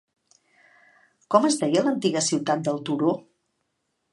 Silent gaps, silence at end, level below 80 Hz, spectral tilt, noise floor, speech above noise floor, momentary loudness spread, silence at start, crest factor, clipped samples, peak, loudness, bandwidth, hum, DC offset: none; 0.9 s; -76 dBFS; -4.5 dB/octave; -76 dBFS; 54 dB; 5 LU; 1.3 s; 24 dB; under 0.1%; -2 dBFS; -23 LUFS; 11.5 kHz; none; under 0.1%